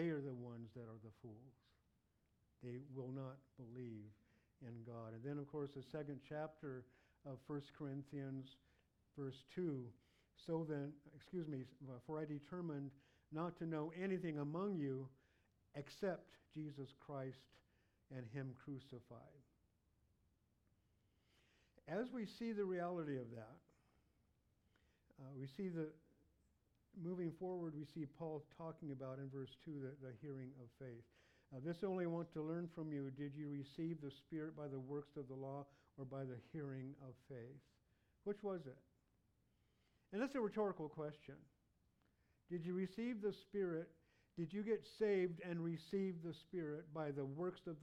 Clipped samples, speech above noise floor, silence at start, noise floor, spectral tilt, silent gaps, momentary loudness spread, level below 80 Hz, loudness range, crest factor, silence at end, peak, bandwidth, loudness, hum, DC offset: under 0.1%; 34 dB; 0 s; -82 dBFS; -8.5 dB/octave; none; 14 LU; -82 dBFS; 10 LU; 20 dB; 0 s; -30 dBFS; 12.5 kHz; -49 LUFS; none; under 0.1%